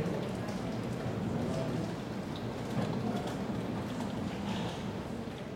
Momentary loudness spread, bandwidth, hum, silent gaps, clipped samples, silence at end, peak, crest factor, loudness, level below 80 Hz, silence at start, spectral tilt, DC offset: 4 LU; 16.5 kHz; none; none; under 0.1%; 0 s; -20 dBFS; 14 dB; -37 LUFS; -56 dBFS; 0 s; -6.5 dB/octave; under 0.1%